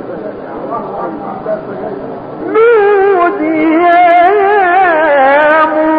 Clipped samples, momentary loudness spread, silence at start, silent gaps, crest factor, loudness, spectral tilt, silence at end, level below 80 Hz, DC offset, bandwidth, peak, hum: under 0.1%; 15 LU; 0 s; none; 10 dB; -9 LUFS; -8 dB/octave; 0 s; -48 dBFS; under 0.1%; 5 kHz; 0 dBFS; none